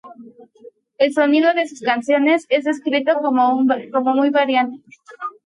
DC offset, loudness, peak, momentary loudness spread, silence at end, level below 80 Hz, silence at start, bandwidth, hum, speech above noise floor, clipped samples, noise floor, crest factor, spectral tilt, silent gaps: under 0.1%; -17 LUFS; -2 dBFS; 5 LU; 0.15 s; -74 dBFS; 0.05 s; 11 kHz; none; 29 dB; under 0.1%; -46 dBFS; 16 dB; -4 dB/octave; none